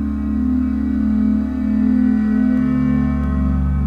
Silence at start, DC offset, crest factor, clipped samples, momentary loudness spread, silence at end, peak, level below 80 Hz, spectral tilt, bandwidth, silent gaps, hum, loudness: 0 s; under 0.1%; 10 dB; under 0.1%; 3 LU; 0 s; -6 dBFS; -24 dBFS; -10 dB/octave; 4.9 kHz; none; none; -17 LUFS